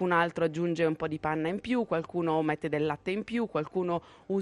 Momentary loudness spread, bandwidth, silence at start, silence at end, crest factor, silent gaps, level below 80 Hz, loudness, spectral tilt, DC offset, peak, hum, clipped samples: 4 LU; 11 kHz; 0 s; 0 s; 16 dB; none; -62 dBFS; -30 LUFS; -7 dB/octave; under 0.1%; -14 dBFS; none; under 0.1%